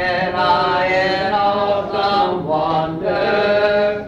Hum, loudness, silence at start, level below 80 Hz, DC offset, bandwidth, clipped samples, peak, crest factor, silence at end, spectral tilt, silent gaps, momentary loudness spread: none; -17 LUFS; 0 s; -46 dBFS; under 0.1%; 7.8 kHz; under 0.1%; -4 dBFS; 14 dB; 0 s; -6 dB/octave; none; 4 LU